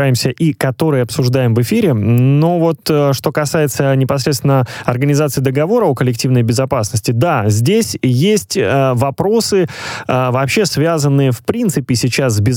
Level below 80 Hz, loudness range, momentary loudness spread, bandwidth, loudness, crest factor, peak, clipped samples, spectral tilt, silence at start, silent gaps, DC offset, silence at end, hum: -48 dBFS; 1 LU; 3 LU; 17.5 kHz; -14 LUFS; 12 dB; 0 dBFS; under 0.1%; -6 dB/octave; 0 s; none; under 0.1%; 0 s; none